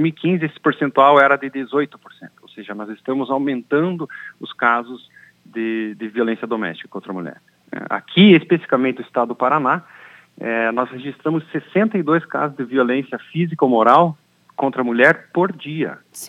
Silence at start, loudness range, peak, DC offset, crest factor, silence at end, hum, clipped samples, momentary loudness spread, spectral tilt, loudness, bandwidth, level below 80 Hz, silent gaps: 0 s; 6 LU; 0 dBFS; under 0.1%; 18 dB; 0 s; none; under 0.1%; 18 LU; -6.5 dB/octave; -18 LUFS; 14 kHz; -76 dBFS; none